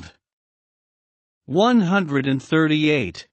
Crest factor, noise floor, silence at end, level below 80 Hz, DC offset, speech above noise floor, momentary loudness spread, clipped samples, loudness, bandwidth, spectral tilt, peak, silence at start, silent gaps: 16 dB; under -90 dBFS; 0.1 s; -58 dBFS; under 0.1%; over 71 dB; 6 LU; under 0.1%; -19 LUFS; 8.4 kHz; -6.5 dB/octave; -6 dBFS; 0 s; 0.33-1.41 s